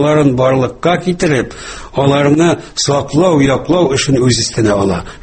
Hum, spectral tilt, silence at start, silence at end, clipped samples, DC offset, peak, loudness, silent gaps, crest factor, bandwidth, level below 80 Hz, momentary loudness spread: none; -5.5 dB/octave; 0 s; 0.05 s; under 0.1%; under 0.1%; 0 dBFS; -12 LUFS; none; 12 dB; 8.8 kHz; -36 dBFS; 5 LU